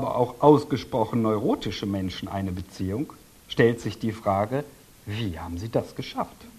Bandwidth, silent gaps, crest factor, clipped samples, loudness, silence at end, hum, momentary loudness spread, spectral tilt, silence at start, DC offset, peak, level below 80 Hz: 14 kHz; none; 22 dB; under 0.1%; -26 LUFS; 0 s; none; 13 LU; -7 dB/octave; 0 s; under 0.1%; -2 dBFS; -52 dBFS